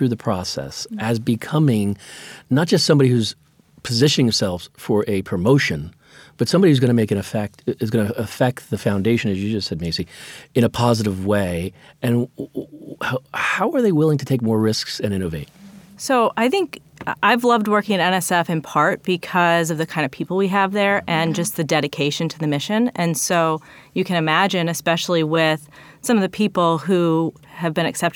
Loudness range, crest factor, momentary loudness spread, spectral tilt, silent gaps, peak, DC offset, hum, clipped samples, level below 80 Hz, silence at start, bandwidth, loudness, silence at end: 3 LU; 18 dB; 11 LU; -5 dB/octave; none; -2 dBFS; under 0.1%; none; under 0.1%; -52 dBFS; 0 s; 19 kHz; -20 LUFS; 0.05 s